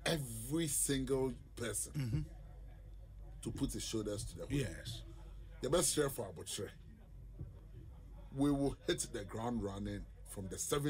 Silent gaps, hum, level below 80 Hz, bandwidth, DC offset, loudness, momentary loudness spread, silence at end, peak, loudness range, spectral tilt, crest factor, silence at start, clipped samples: none; none; -52 dBFS; 16 kHz; under 0.1%; -39 LUFS; 21 LU; 0 s; -22 dBFS; 4 LU; -4.5 dB/octave; 18 dB; 0 s; under 0.1%